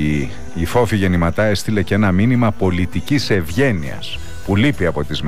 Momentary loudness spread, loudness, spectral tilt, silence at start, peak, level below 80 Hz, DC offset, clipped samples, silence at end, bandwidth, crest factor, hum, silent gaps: 10 LU; -17 LUFS; -6.5 dB/octave; 0 s; -6 dBFS; -34 dBFS; 5%; under 0.1%; 0 s; 15.5 kHz; 12 dB; none; none